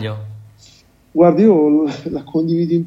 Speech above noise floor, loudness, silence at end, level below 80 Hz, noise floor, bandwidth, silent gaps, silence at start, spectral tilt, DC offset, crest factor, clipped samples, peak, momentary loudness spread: 35 dB; -15 LUFS; 0 s; -54 dBFS; -49 dBFS; 7.6 kHz; none; 0 s; -9 dB/octave; under 0.1%; 14 dB; under 0.1%; 0 dBFS; 16 LU